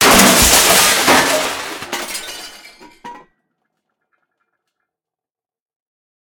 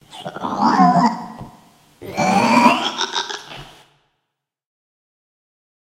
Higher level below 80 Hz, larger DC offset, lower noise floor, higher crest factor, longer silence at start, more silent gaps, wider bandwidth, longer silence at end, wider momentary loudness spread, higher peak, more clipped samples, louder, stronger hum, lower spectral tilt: first, -36 dBFS vs -58 dBFS; neither; first, under -90 dBFS vs -78 dBFS; about the same, 16 dB vs 20 dB; second, 0 s vs 0.15 s; neither; first, over 20 kHz vs 16 kHz; first, 3.05 s vs 2.3 s; second, 20 LU vs 23 LU; about the same, 0 dBFS vs 0 dBFS; neither; first, -10 LUFS vs -17 LUFS; neither; second, -1.5 dB/octave vs -4.5 dB/octave